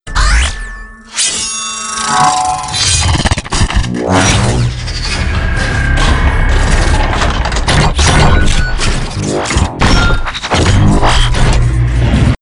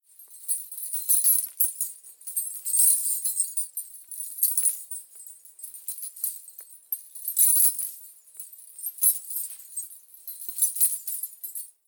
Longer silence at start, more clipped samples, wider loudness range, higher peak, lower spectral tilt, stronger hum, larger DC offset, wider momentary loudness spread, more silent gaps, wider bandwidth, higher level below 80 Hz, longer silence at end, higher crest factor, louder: second, 0.05 s vs 0.2 s; neither; second, 1 LU vs 6 LU; first, 0 dBFS vs -6 dBFS; first, -4 dB/octave vs 7 dB/octave; neither; neither; second, 7 LU vs 22 LU; neither; second, 11 kHz vs over 20 kHz; first, -14 dBFS vs under -90 dBFS; second, 0.05 s vs 0.2 s; second, 10 dB vs 22 dB; first, -12 LUFS vs -23 LUFS